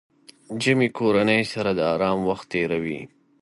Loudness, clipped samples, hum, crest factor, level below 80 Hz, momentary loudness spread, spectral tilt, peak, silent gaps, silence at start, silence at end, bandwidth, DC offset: -22 LUFS; under 0.1%; none; 18 dB; -56 dBFS; 9 LU; -5.5 dB/octave; -6 dBFS; none; 0.5 s; 0.35 s; 11.5 kHz; under 0.1%